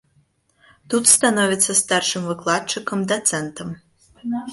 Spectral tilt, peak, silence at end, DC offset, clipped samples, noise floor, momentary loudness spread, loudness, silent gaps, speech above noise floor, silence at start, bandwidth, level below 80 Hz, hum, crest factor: -2 dB/octave; 0 dBFS; 0 s; under 0.1%; under 0.1%; -62 dBFS; 19 LU; -18 LUFS; none; 42 dB; 0.9 s; 12 kHz; -60 dBFS; none; 22 dB